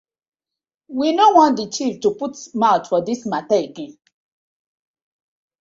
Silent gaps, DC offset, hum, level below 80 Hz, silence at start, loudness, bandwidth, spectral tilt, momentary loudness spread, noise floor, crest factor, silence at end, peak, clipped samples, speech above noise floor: none; under 0.1%; none; -66 dBFS; 0.9 s; -18 LUFS; 7.8 kHz; -4.5 dB/octave; 17 LU; -88 dBFS; 20 dB; 1.7 s; 0 dBFS; under 0.1%; 70 dB